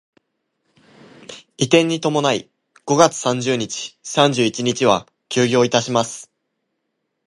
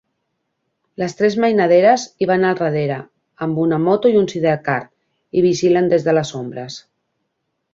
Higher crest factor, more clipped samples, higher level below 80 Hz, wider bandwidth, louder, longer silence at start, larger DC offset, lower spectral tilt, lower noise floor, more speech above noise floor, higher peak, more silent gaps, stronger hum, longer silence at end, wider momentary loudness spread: about the same, 20 dB vs 16 dB; neither; about the same, -62 dBFS vs -60 dBFS; first, 11.5 kHz vs 7.8 kHz; about the same, -18 LUFS vs -17 LUFS; first, 1.3 s vs 1 s; neither; second, -4 dB/octave vs -6 dB/octave; about the same, -74 dBFS vs -73 dBFS; about the same, 57 dB vs 57 dB; about the same, 0 dBFS vs -2 dBFS; neither; neither; about the same, 1 s vs 0.95 s; about the same, 13 LU vs 14 LU